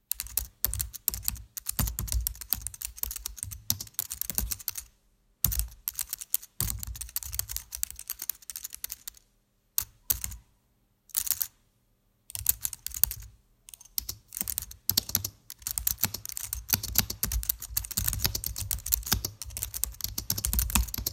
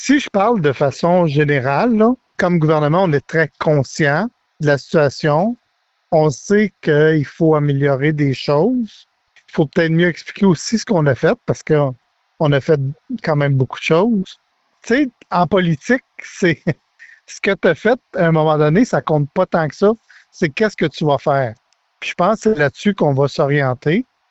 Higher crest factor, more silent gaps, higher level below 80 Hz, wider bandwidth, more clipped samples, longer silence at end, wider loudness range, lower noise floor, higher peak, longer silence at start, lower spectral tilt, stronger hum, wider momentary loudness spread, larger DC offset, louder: first, 34 dB vs 14 dB; neither; first, -42 dBFS vs -50 dBFS; first, 17 kHz vs 8.2 kHz; neither; second, 0 s vs 0.3 s; about the same, 5 LU vs 3 LU; first, -70 dBFS vs -65 dBFS; about the same, 0 dBFS vs -2 dBFS; about the same, 0.1 s vs 0 s; second, -1.5 dB/octave vs -6.5 dB/octave; neither; first, 10 LU vs 7 LU; neither; second, -31 LUFS vs -16 LUFS